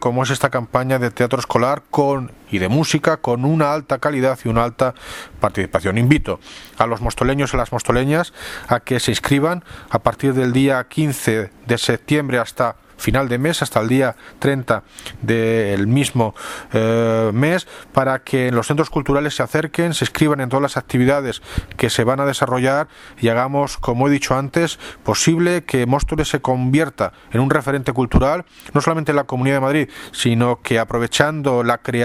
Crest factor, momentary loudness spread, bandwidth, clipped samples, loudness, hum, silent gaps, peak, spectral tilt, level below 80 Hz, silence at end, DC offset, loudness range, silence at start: 18 dB; 6 LU; 15.5 kHz; under 0.1%; -18 LUFS; none; none; 0 dBFS; -5.5 dB/octave; -36 dBFS; 0 s; under 0.1%; 1 LU; 0 s